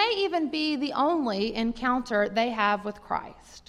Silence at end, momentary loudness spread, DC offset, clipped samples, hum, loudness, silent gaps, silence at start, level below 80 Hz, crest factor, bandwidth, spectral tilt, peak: 0.1 s; 8 LU; under 0.1%; under 0.1%; none; -27 LUFS; none; 0 s; -54 dBFS; 16 dB; 12 kHz; -5 dB/octave; -10 dBFS